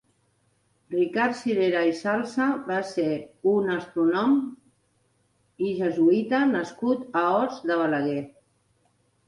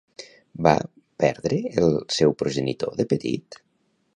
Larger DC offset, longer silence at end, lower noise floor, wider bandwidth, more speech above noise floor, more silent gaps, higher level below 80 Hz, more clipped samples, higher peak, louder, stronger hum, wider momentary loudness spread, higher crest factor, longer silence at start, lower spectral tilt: neither; first, 1 s vs 0.6 s; about the same, -68 dBFS vs -69 dBFS; about the same, 11 kHz vs 10.5 kHz; about the same, 44 dB vs 46 dB; neither; second, -72 dBFS vs -54 dBFS; neither; second, -10 dBFS vs -2 dBFS; about the same, -25 LUFS vs -23 LUFS; neither; second, 7 LU vs 15 LU; second, 14 dB vs 22 dB; first, 0.9 s vs 0.2 s; about the same, -6.5 dB/octave vs -5.5 dB/octave